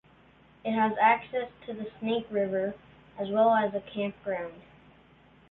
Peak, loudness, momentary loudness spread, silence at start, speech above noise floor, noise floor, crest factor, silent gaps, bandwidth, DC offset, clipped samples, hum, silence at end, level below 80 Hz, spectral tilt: -10 dBFS; -29 LUFS; 15 LU; 0.65 s; 30 dB; -59 dBFS; 20 dB; none; 4.1 kHz; under 0.1%; under 0.1%; none; 0.9 s; -66 dBFS; -9 dB/octave